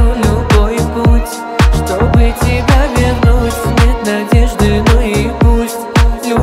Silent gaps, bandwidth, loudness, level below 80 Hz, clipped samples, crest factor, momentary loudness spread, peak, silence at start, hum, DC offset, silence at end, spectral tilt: none; 15.5 kHz; -12 LUFS; -14 dBFS; under 0.1%; 10 dB; 4 LU; 0 dBFS; 0 s; none; under 0.1%; 0 s; -6 dB/octave